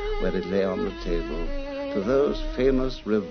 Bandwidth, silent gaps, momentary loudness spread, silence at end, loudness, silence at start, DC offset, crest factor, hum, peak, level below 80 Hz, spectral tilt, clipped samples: 6.6 kHz; none; 9 LU; 0 s; -26 LUFS; 0 s; under 0.1%; 16 dB; none; -10 dBFS; -32 dBFS; -7 dB/octave; under 0.1%